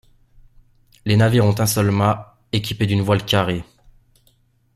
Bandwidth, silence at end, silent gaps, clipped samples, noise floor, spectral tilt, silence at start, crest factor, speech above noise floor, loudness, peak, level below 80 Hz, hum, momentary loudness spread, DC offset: 14 kHz; 1.15 s; none; under 0.1%; -59 dBFS; -5.5 dB/octave; 1.05 s; 18 dB; 42 dB; -19 LUFS; -2 dBFS; -48 dBFS; none; 10 LU; under 0.1%